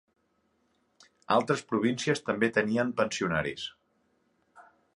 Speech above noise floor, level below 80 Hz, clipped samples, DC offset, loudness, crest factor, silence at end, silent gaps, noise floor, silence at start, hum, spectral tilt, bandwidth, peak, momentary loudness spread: 45 dB; -64 dBFS; under 0.1%; under 0.1%; -29 LUFS; 22 dB; 0.35 s; none; -73 dBFS; 1.3 s; none; -5 dB/octave; 11.5 kHz; -10 dBFS; 6 LU